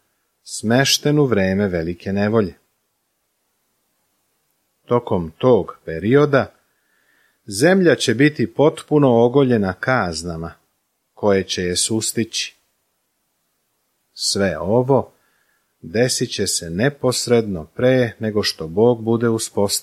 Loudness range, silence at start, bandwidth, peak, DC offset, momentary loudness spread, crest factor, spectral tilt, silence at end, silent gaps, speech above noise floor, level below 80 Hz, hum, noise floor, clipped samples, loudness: 6 LU; 0.45 s; 15 kHz; -2 dBFS; under 0.1%; 10 LU; 18 dB; -4.5 dB/octave; 0 s; none; 53 dB; -52 dBFS; none; -70 dBFS; under 0.1%; -18 LUFS